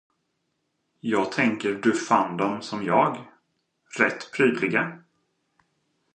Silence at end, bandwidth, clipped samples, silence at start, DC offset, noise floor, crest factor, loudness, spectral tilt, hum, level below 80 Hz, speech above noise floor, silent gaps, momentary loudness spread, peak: 1.15 s; 9.6 kHz; under 0.1%; 1.05 s; under 0.1%; -76 dBFS; 20 dB; -24 LUFS; -5 dB/octave; none; -72 dBFS; 52 dB; none; 9 LU; -6 dBFS